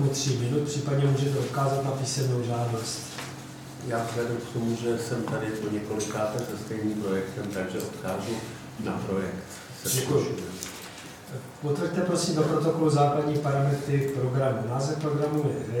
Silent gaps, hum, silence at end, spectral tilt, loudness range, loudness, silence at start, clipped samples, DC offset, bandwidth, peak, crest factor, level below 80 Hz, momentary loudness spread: none; none; 0 s; -5.5 dB/octave; 6 LU; -28 LUFS; 0 s; under 0.1%; under 0.1%; 19 kHz; -12 dBFS; 16 dB; -60 dBFS; 12 LU